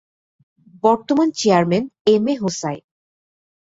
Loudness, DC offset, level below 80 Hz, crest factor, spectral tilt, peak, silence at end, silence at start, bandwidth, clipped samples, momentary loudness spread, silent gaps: -18 LUFS; under 0.1%; -62 dBFS; 18 dB; -5.5 dB/octave; -2 dBFS; 1 s; 0.85 s; 8 kHz; under 0.1%; 10 LU; 2.01-2.05 s